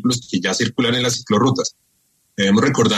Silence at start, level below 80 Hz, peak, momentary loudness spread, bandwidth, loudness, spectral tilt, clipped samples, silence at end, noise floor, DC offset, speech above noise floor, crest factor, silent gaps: 0 s; -54 dBFS; -4 dBFS; 7 LU; 13.5 kHz; -18 LUFS; -4.5 dB/octave; under 0.1%; 0 s; -63 dBFS; under 0.1%; 46 dB; 16 dB; none